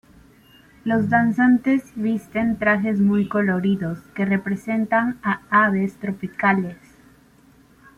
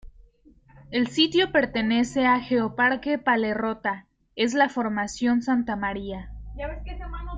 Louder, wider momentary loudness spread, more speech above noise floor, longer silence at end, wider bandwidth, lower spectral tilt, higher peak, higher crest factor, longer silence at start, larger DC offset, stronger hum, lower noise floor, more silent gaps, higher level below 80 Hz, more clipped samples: first, -21 LUFS vs -24 LUFS; second, 9 LU vs 15 LU; about the same, 33 dB vs 32 dB; first, 1.25 s vs 0 s; first, 11 kHz vs 9 kHz; first, -8 dB/octave vs -4.5 dB/octave; first, -4 dBFS vs -8 dBFS; about the same, 18 dB vs 18 dB; first, 0.85 s vs 0.05 s; neither; neither; about the same, -53 dBFS vs -56 dBFS; neither; second, -56 dBFS vs -44 dBFS; neither